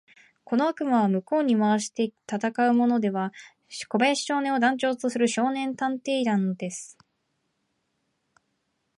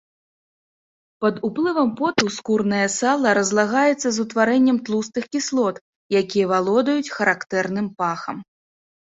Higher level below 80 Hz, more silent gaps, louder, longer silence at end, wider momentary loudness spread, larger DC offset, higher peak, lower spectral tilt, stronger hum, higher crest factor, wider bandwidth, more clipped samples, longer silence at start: second, -78 dBFS vs -64 dBFS; second, none vs 5.81-6.10 s; second, -25 LUFS vs -20 LUFS; first, 2.15 s vs 0.75 s; first, 10 LU vs 7 LU; neither; second, -10 dBFS vs -2 dBFS; about the same, -5 dB/octave vs -4 dB/octave; neither; about the same, 16 dB vs 18 dB; first, 11.5 kHz vs 8 kHz; neither; second, 0.5 s vs 1.2 s